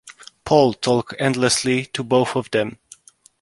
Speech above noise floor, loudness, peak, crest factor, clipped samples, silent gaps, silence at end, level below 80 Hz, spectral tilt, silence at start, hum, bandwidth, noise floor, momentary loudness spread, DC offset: 30 dB; -19 LUFS; -2 dBFS; 20 dB; under 0.1%; none; 0.65 s; -54 dBFS; -4.5 dB/octave; 0.05 s; none; 11.5 kHz; -48 dBFS; 7 LU; under 0.1%